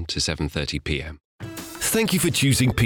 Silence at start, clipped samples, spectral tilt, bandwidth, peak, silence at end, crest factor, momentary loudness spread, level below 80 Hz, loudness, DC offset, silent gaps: 0 s; under 0.1%; -4 dB/octave; over 20 kHz; -6 dBFS; 0 s; 18 dB; 17 LU; -38 dBFS; -22 LUFS; under 0.1%; 1.25-1.39 s